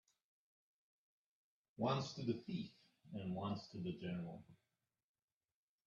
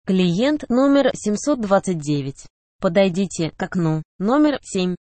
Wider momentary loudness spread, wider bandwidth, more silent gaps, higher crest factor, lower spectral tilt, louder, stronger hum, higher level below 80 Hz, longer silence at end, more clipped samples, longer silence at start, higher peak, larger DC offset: first, 13 LU vs 7 LU; second, 7.4 kHz vs 8.8 kHz; second, none vs 2.50-2.79 s, 4.05-4.19 s; first, 22 dB vs 16 dB; about the same, -6.5 dB/octave vs -6 dB/octave; second, -45 LUFS vs -20 LUFS; neither; second, -80 dBFS vs -52 dBFS; first, 1.3 s vs 0.15 s; neither; first, 1.8 s vs 0.05 s; second, -26 dBFS vs -4 dBFS; neither